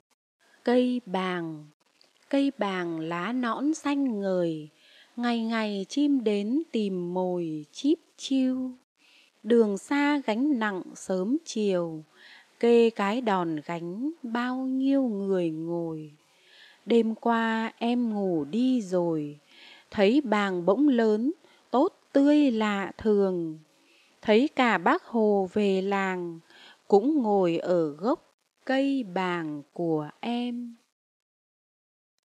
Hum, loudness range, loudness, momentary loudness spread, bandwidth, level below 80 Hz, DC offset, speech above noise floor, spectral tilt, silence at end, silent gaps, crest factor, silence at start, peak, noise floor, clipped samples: none; 5 LU; -27 LUFS; 11 LU; 10 kHz; -72 dBFS; under 0.1%; 38 dB; -6 dB/octave; 1.5 s; 1.74-1.80 s, 8.84-8.96 s, 28.34-28.38 s; 20 dB; 0.65 s; -8 dBFS; -64 dBFS; under 0.1%